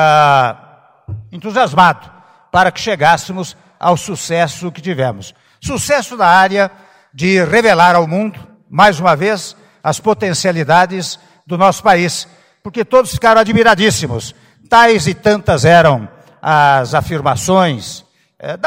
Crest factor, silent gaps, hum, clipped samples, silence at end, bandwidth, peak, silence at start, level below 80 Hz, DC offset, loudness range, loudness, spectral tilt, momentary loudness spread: 12 dB; none; none; 0.3%; 0 s; 16.5 kHz; 0 dBFS; 0 s; -44 dBFS; under 0.1%; 4 LU; -12 LUFS; -4.5 dB/octave; 17 LU